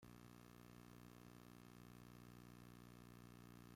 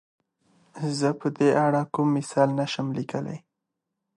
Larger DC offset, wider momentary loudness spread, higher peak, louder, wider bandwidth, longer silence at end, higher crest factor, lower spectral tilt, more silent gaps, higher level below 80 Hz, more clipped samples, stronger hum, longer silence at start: neither; second, 1 LU vs 11 LU; second, -50 dBFS vs -6 dBFS; second, -63 LUFS vs -25 LUFS; first, 16.5 kHz vs 11.5 kHz; second, 0 s vs 0.8 s; second, 12 dB vs 20 dB; about the same, -5.5 dB/octave vs -6.5 dB/octave; neither; about the same, -76 dBFS vs -72 dBFS; neither; first, 60 Hz at -65 dBFS vs none; second, 0 s vs 0.75 s